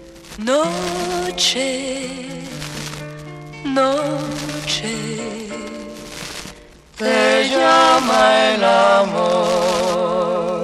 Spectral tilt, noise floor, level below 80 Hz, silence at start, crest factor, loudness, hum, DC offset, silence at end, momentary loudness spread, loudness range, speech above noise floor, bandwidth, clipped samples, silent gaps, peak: -3.5 dB/octave; -41 dBFS; -48 dBFS; 0 s; 16 dB; -17 LUFS; none; under 0.1%; 0 s; 18 LU; 9 LU; 25 dB; 14 kHz; under 0.1%; none; -2 dBFS